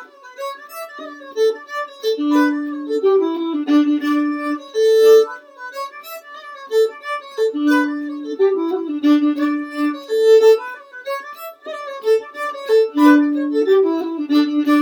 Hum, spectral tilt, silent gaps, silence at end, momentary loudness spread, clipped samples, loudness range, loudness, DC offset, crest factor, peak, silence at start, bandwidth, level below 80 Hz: none; -3 dB/octave; none; 0 s; 19 LU; under 0.1%; 4 LU; -17 LUFS; under 0.1%; 16 dB; 0 dBFS; 0 s; 19 kHz; -82 dBFS